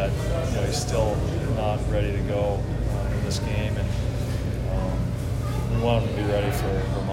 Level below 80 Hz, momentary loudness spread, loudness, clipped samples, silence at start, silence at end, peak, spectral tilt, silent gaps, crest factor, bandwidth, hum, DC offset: -32 dBFS; 4 LU; -26 LUFS; under 0.1%; 0 s; 0 s; -10 dBFS; -6.5 dB/octave; none; 14 dB; 16 kHz; none; under 0.1%